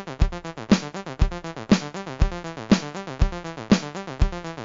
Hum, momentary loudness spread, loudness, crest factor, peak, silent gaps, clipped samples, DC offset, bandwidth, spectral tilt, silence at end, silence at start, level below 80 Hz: none; 11 LU; -25 LUFS; 18 dB; -6 dBFS; none; under 0.1%; under 0.1%; 7.6 kHz; -6 dB/octave; 0 s; 0 s; -28 dBFS